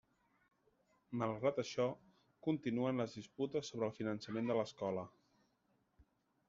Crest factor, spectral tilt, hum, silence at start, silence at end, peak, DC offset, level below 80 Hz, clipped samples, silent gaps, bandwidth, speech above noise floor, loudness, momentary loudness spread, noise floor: 18 dB; -6 dB/octave; none; 1.1 s; 1.4 s; -24 dBFS; under 0.1%; -80 dBFS; under 0.1%; none; 7.4 kHz; 40 dB; -41 LUFS; 7 LU; -79 dBFS